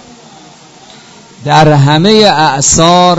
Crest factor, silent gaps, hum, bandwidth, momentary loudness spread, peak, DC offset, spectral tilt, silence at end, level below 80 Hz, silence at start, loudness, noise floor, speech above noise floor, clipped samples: 8 dB; none; none; 11 kHz; 4 LU; 0 dBFS; under 0.1%; -4 dB/octave; 0 s; -34 dBFS; 1.4 s; -6 LUFS; -36 dBFS; 30 dB; 2%